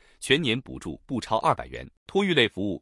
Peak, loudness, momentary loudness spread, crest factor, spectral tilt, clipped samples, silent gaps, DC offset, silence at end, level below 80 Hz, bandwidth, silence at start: -6 dBFS; -25 LUFS; 16 LU; 20 dB; -4.5 dB/octave; under 0.1%; 1.97-2.06 s; under 0.1%; 0.05 s; -52 dBFS; 12 kHz; 0.2 s